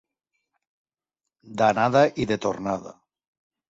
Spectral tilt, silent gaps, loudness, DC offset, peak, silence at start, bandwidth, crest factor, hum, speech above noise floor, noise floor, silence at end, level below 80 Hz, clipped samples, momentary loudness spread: -6 dB/octave; none; -23 LUFS; under 0.1%; -6 dBFS; 1.45 s; 7.8 kHz; 20 dB; none; 64 dB; -87 dBFS; 0.8 s; -58 dBFS; under 0.1%; 12 LU